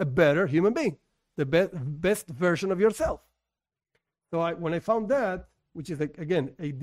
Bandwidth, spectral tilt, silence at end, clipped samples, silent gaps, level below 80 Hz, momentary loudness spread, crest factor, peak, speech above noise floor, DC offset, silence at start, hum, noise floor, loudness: 16 kHz; -6.5 dB/octave; 0 s; under 0.1%; none; -52 dBFS; 13 LU; 18 dB; -10 dBFS; 63 dB; under 0.1%; 0 s; none; -90 dBFS; -27 LUFS